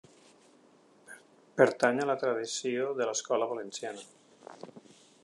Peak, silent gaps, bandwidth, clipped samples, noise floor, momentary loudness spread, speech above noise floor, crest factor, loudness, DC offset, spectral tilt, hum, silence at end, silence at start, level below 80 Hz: -8 dBFS; none; 11.5 kHz; under 0.1%; -62 dBFS; 26 LU; 32 dB; 26 dB; -30 LUFS; under 0.1%; -3.5 dB/octave; none; 0.45 s; 1.1 s; -86 dBFS